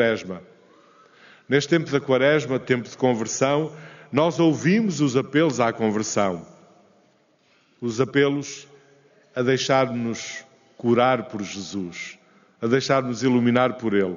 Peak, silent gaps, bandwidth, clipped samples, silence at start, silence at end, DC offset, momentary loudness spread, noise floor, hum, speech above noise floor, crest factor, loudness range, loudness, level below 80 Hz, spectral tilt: -6 dBFS; none; 7.4 kHz; under 0.1%; 0 s; 0 s; under 0.1%; 14 LU; -61 dBFS; none; 40 dB; 18 dB; 4 LU; -22 LUFS; -66 dBFS; -5 dB/octave